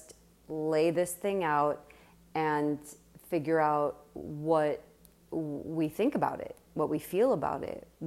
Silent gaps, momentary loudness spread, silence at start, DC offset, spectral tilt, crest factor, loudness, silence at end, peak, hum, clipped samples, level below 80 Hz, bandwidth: none; 13 LU; 0 s; under 0.1%; -6 dB/octave; 16 dB; -31 LUFS; 0 s; -14 dBFS; none; under 0.1%; -66 dBFS; 16 kHz